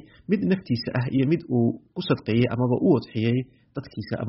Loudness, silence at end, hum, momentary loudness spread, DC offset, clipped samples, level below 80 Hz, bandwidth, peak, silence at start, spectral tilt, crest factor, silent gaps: -24 LUFS; 0 s; none; 11 LU; under 0.1%; under 0.1%; -56 dBFS; 5.8 kHz; -6 dBFS; 0.3 s; -7 dB/octave; 18 dB; none